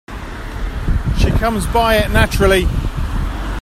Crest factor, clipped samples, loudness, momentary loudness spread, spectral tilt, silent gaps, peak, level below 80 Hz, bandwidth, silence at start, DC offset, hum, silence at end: 16 dB; under 0.1%; -17 LUFS; 13 LU; -5.5 dB/octave; none; 0 dBFS; -20 dBFS; 15 kHz; 0.1 s; under 0.1%; none; 0 s